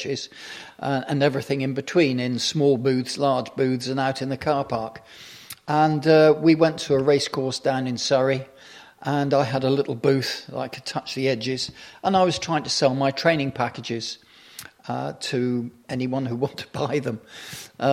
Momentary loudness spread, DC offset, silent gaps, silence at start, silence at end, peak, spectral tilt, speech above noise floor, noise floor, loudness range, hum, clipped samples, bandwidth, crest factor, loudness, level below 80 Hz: 16 LU; under 0.1%; none; 0 s; 0 s; -4 dBFS; -5.5 dB/octave; 24 dB; -47 dBFS; 7 LU; none; under 0.1%; 15.5 kHz; 18 dB; -23 LUFS; -62 dBFS